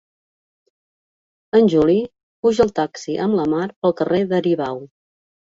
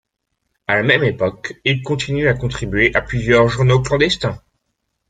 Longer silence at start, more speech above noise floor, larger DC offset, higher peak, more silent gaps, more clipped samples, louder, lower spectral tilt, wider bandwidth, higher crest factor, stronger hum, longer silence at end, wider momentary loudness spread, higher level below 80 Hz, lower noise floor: first, 1.55 s vs 0.7 s; first, over 72 dB vs 57 dB; neither; about the same, -2 dBFS vs -2 dBFS; first, 2.23-2.43 s, 3.76-3.82 s vs none; neither; about the same, -19 LUFS vs -17 LUFS; first, -7 dB/octave vs -5.5 dB/octave; second, 7.8 kHz vs 9.2 kHz; about the same, 18 dB vs 16 dB; neither; second, 0.55 s vs 0.75 s; about the same, 9 LU vs 8 LU; second, -52 dBFS vs -38 dBFS; first, under -90 dBFS vs -73 dBFS